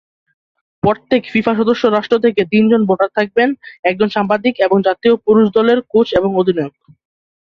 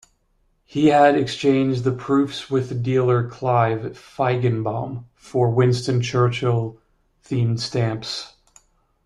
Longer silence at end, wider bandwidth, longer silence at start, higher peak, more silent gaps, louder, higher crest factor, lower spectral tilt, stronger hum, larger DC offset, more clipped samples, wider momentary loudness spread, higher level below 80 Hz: about the same, 0.9 s vs 0.8 s; second, 6.4 kHz vs 10.5 kHz; about the same, 0.85 s vs 0.75 s; first, 0 dBFS vs -4 dBFS; first, 3.79-3.83 s vs none; first, -14 LUFS vs -21 LUFS; about the same, 14 dB vs 16 dB; about the same, -7.5 dB/octave vs -7 dB/octave; neither; neither; neither; second, 6 LU vs 12 LU; about the same, -52 dBFS vs -54 dBFS